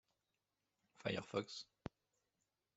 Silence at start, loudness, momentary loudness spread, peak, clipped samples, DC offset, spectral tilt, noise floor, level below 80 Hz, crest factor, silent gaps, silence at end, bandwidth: 1 s; -47 LUFS; 13 LU; -26 dBFS; under 0.1%; under 0.1%; -5 dB/octave; -89 dBFS; -78 dBFS; 26 dB; none; 0.9 s; 8.2 kHz